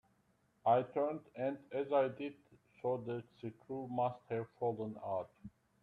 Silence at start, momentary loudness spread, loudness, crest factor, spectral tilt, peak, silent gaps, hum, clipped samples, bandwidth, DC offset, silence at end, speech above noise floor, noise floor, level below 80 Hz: 0.65 s; 14 LU; -39 LUFS; 20 dB; -9 dB/octave; -18 dBFS; none; none; under 0.1%; 4.7 kHz; under 0.1%; 0.35 s; 37 dB; -75 dBFS; -78 dBFS